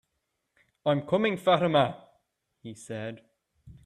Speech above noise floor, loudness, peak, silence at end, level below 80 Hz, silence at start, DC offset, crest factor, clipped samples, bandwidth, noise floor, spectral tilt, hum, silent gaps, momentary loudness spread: 54 dB; -27 LUFS; -10 dBFS; 0.15 s; -66 dBFS; 0.85 s; under 0.1%; 20 dB; under 0.1%; 13 kHz; -80 dBFS; -6 dB/octave; none; none; 22 LU